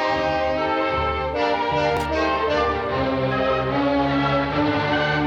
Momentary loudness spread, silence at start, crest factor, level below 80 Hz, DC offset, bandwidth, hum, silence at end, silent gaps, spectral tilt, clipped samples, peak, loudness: 2 LU; 0 s; 14 dB; -38 dBFS; under 0.1%; 12 kHz; none; 0 s; none; -6.5 dB/octave; under 0.1%; -8 dBFS; -21 LUFS